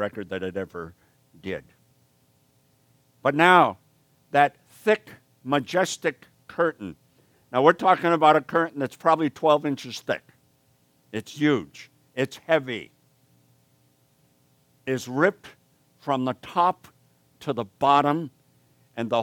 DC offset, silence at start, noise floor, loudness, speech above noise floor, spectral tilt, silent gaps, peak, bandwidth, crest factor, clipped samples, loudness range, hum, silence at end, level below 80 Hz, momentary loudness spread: under 0.1%; 0 s; -64 dBFS; -24 LUFS; 41 dB; -5 dB/octave; none; -2 dBFS; 18 kHz; 24 dB; under 0.1%; 9 LU; none; 0 s; -70 dBFS; 19 LU